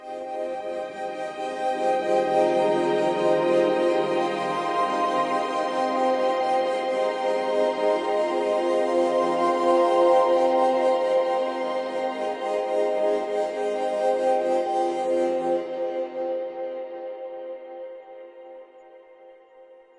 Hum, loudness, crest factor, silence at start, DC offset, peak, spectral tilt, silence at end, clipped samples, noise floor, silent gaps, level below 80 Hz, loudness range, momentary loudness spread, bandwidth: none; -24 LUFS; 16 dB; 0 s; under 0.1%; -8 dBFS; -5 dB/octave; 0.25 s; under 0.1%; -50 dBFS; none; -72 dBFS; 9 LU; 12 LU; 11 kHz